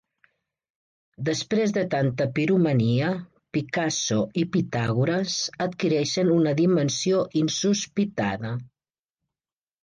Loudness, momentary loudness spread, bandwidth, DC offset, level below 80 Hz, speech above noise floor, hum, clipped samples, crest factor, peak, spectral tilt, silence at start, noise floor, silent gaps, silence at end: -24 LUFS; 7 LU; 10.5 kHz; under 0.1%; -62 dBFS; over 66 dB; none; under 0.1%; 14 dB; -12 dBFS; -5 dB/octave; 1.2 s; under -90 dBFS; none; 1.15 s